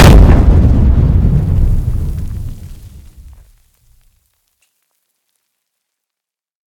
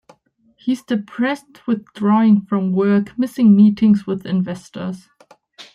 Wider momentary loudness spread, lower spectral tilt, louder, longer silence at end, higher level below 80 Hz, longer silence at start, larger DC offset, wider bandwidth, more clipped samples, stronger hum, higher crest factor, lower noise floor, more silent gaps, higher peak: first, 20 LU vs 16 LU; about the same, -7 dB/octave vs -8 dB/octave; first, -11 LUFS vs -17 LUFS; first, 3.7 s vs 0.1 s; first, -14 dBFS vs -60 dBFS; second, 0 s vs 0.65 s; neither; first, 15.5 kHz vs 10.5 kHz; first, 3% vs under 0.1%; neither; about the same, 12 dB vs 14 dB; first, -84 dBFS vs -57 dBFS; neither; first, 0 dBFS vs -4 dBFS